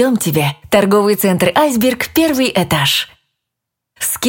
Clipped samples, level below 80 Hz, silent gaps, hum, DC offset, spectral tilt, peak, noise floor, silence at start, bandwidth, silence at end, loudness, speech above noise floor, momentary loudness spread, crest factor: under 0.1%; -46 dBFS; none; none; under 0.1%; -4 dB/octave; 0 dBFS; -79 dBFS; 0 s; 17 kHz; 0 s; -14 LUFS; 65 dB; 5 LU; 14 dB